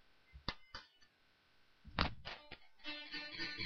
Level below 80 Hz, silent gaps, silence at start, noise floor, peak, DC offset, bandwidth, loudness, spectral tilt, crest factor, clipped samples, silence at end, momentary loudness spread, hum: -56 dBFS; none; 0.05 s; -73 dBFS; -14 dBFS; under 0.1%; 6.8 kHz; -45 LUFS; -2 dB/octave; 34 dB; under 0.1%; 0 s; 20 LU; none